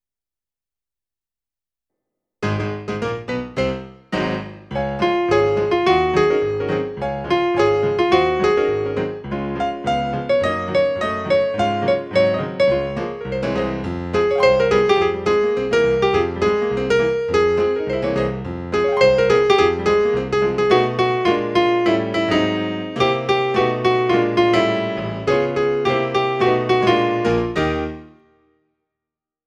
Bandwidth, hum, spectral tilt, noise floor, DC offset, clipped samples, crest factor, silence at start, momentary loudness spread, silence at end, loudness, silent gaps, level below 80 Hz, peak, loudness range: 9.2 kHz; none; -6 dB/octave; under -90 dBFS; under 0.1%; under 0.1%; 16 dB; 2.4 s; 9 LU; 1.4 s; -19 LUFS; none; -42 dBFS; -2 dBFS; 5 LU